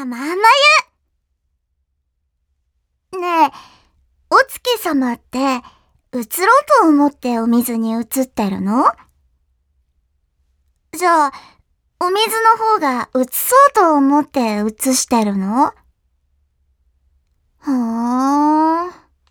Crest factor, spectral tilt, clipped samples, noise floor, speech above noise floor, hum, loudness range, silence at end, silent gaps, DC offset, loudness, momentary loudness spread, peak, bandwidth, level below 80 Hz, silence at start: 16 dB; -3.5 dB/octave; under 0.1%; -70 dBFS; 55 dB; none; 7 LU; 0.4 s; none; under 0.1%; -15 LUFS; 11 LU; 0 dBFS; over 20 kHz; -58 dBFS; 0 s